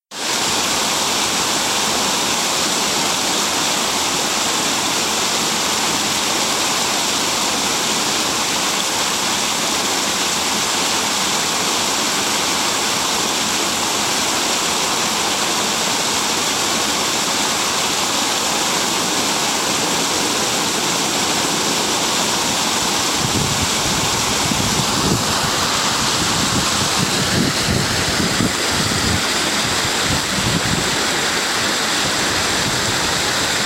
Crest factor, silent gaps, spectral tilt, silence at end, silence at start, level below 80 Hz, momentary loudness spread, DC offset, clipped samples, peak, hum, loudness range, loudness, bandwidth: 16 dB; none; -1.5 dB/octave; 0 s; 0.1 s; -42 dBFS; 1 LU; under 0.1%; under 0.1%; -2 dBFS; none; 0 LU; -16 LUFS; 16 kHz